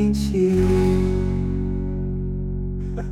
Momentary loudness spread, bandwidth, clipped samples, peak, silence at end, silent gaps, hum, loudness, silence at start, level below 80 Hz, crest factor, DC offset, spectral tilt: 10 LU; 13.5 kHz; under 0.1%; -8 dBFS; 0 s; none; none; -22 LUFS; 0 s; -28 dBFS; 12 dB; under 0.1%; -8 dB/octave